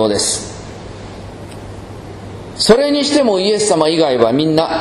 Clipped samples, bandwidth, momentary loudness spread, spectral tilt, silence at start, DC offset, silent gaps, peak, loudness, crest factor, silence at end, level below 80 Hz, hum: 0.1%; 13.5 kHz; 20 LU; -4 dB/octave; 0 s; under 0.1%; none; 0 dBFS; -13 LUFS; 16 dB; 0 s; -42 dBFS; none